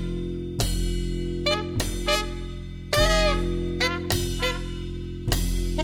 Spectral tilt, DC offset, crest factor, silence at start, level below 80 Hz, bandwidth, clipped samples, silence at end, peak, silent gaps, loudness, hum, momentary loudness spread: -4 dB/octave; under 0.1%; 18 dB; 0 s; -30 dBFS; 17 kHz; under 0.1%; 0 s; -6 dBFS; none; -26 LUFS; none; 12 LU